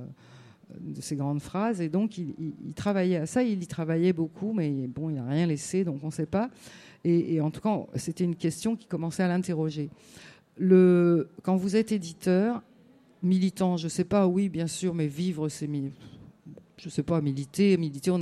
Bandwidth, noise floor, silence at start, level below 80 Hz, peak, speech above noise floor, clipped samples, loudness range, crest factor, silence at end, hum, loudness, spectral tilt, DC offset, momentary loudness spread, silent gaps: 12.5 kHz; -58 dBFS; 0 s; -62 dBFS; -10 dBFS; 31 dB; under 0.1%; 5 LU; 18 dB; 0 s; none; -28 LUFS; -7 dB/octave; under 0.1%; 11 LU; none